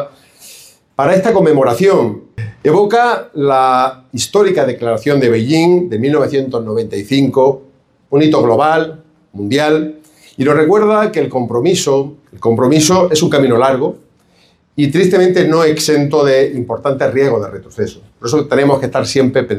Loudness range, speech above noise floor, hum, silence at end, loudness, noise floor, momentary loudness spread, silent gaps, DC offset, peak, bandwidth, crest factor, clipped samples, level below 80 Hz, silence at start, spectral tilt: 2 LU; 40 dB; none; 0 s; -12 LUFS; -52 dBFS; 10 LU; none; under 0.1%; 0 dBFS; 15.5 kHz; 12 dB; under 0.1%; -52 dBFS; 0 s; -5.5 dB/octave